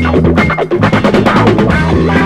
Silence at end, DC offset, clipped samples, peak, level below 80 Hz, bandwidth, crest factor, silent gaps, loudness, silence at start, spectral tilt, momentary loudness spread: 0 s; under 0.1%; 0.4%; 0 dBFS; -24 dBFS; 11.5 kHz; 8 dB; none; -10 LUFS; 0 s; -7.5 dB/octave; 3 LU